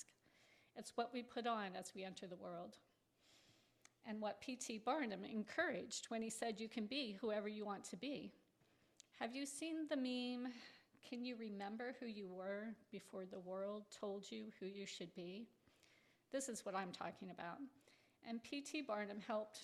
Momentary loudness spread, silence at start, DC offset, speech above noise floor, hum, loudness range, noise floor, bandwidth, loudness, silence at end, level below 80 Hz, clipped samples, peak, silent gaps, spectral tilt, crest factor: 11 LU; 0 s; under 0.1%; 30 dB; none; 6 LU; -78 dBFS; 14 kHz; -48 LUFS; 0 s; -90 dBFS; under 0.1%; -30 dBFS; none; -3.5 dB/octave; 20 dB